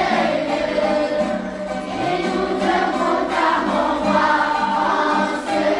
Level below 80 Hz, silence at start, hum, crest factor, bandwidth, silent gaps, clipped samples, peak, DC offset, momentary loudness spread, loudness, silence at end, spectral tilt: -48 dBFS; 0 s; none; 14 dB; 11.5 kHz; none; under 0.1%; -6 dBFS; under 0.1%; 6 LU; -19 LUFS; 0 s; -5 dB/octave